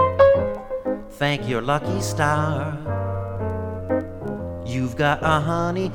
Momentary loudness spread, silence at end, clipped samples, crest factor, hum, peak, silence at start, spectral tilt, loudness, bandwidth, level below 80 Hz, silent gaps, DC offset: 10 LU; 0 s; under 0.1%; 18 dB; none; -4 dBFS; 0 s; -6 dB/octave; -23 LUFS; 18.5 kHz; -42 dBFS; none; under 0.1%